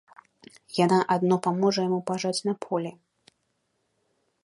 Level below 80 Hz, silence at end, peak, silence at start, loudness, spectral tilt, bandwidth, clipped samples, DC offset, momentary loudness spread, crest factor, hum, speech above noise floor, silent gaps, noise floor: -74 dBFS; 1.55 s; -8 dBFS; 0.7 s; -25 LUFS; -5.5 dB/octave; 11.5 kHz; under 0.1%; under 0.1%; 9 LU; 20 dB; none; 50 dB; none; -75 dBFS